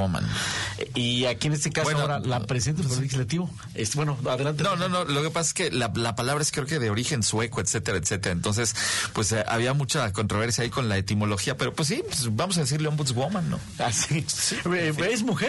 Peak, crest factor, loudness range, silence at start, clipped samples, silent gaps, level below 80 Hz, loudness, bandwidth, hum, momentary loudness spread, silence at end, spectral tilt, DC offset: -14 dBFS; 12 dB; 1 LU; 0 s; under 0.1%; none; -50 dBFS; -26 LUFS; 12 kHz; none; 3 LU; 0 s; -4 dB/octave; under 0.1%